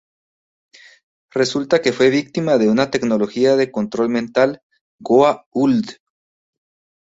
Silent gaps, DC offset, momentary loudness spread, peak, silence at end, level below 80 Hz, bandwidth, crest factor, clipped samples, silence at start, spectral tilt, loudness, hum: 4.63-4.70 s, 4.81-4.99 s, 5.46-5.51 s; under 0.1%; 7 LU; -2 dBFS; 1.15 s; -60 dBFS; 8 kHz; 16 dB; under 0.1%; 1.35 s; -5.5 dB/octave; -17 LUFS; none